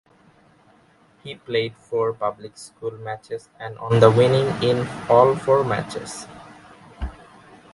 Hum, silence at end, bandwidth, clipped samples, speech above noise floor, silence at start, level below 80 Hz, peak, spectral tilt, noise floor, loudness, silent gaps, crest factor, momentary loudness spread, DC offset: none; 0.65 s; 11.5 kHz; under 0.1%; 35 dB; 1.25 s; -46 dBFS; 0 dBFS; -6.5 dB/octave; -56 dBFS; -20 LUFS; none; 22 dB; 21 LU; under 0.1%